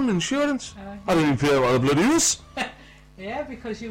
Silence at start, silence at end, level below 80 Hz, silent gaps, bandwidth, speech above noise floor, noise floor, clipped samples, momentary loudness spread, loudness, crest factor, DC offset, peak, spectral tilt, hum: 0 s; 0 s; -48 dBFS; none; 16.5 kHz; 24 dB; -47 dBFS; under 0.1%; 14 LU; -22 LUFS; 12 dB; under 0.1%; -12 dBFS; -4 dB/octave; none